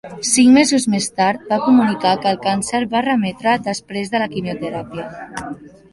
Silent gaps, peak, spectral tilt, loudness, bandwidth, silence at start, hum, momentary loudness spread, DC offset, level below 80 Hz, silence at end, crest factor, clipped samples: none; -2 dBFS; -4 dB/octave; -17 LUFS; 11.5 kHz; 0.05 s; none; 17 LU; under 0.1%; -54 dBFS; 0.25 s; 16 dB; under 0.1%